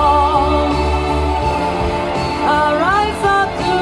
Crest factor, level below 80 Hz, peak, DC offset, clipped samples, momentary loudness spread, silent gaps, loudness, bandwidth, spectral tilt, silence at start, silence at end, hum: 14 dB; -26 dBFS; -2 dBFS; under 0.1%; under 0.1%; 5 LU; none; -15 LUFS; 12 kHz; -5.5 dB/octave; 0 s; 0 s; none